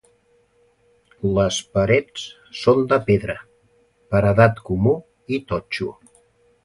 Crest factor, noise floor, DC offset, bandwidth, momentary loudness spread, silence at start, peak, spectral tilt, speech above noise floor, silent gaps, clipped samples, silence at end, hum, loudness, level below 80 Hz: 20 dB; -60 dBFS; under 0.1%; 11.5 kHz; 14 LU; 1.25 s; 0 dBFS; -6 dB/octave; 41 dB; none; under 0.1%; 0.75 s; none; -20 LUFS; -44 dBFS